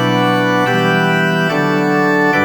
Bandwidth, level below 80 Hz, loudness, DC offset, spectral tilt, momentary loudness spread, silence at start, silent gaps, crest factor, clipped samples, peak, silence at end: 19 kHz; -62 dBFS; -13 LUFS; under 0.1%; -6 dB/octave; 2 LU; 0 s; none; 12 dB; under 0.1%; 0 dBFS; 0 s